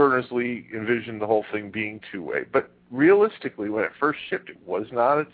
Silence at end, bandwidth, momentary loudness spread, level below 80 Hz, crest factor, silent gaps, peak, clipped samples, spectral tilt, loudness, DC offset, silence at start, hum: 0.1 s; 4.7 kHz; 12 LU; -68 dBFS; 18 dB; none; -6 dBFS; under 0.1%; -10 dB/octave; -24 LUFS; under 0.1%; 0 s; none